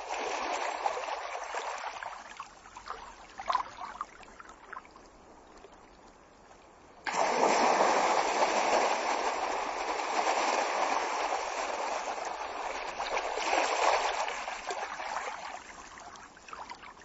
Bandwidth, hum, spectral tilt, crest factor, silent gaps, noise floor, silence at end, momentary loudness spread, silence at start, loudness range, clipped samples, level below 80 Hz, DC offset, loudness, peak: 8 kHz; none; 0.5 dB/octave; 22 dB; none; -56 dBFS; 0 s; 20 LU; 0 s; 12 LU; under 0.1%; -64 dBFS; under 0.1%; -31 LUFS; -12 dBFS